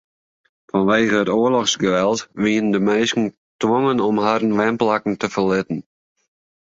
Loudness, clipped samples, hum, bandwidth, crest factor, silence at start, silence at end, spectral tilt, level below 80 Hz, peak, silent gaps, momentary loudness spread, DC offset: -19 LUFS; under 0.1%; none; 7.8 kHz; 16 dB; 0.75 s; 0.9 s; -4.5 dB/octave; -58 dBFS; -2 dBFS; 3.38-3.59 s; 6 LU; under 0.1%